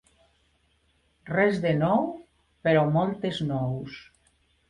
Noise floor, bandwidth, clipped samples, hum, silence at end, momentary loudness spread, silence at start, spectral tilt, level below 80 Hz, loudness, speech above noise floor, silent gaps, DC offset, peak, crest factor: -68 dBFS; 10.5 kHz; under 0.1%; none; 0.65 s; 14 LU; 1.25 s; -8 dB/octave; -60 dBFS; -26 LUFS; 43 dB; none; under 0.1%; -10 dBFS; 18 dB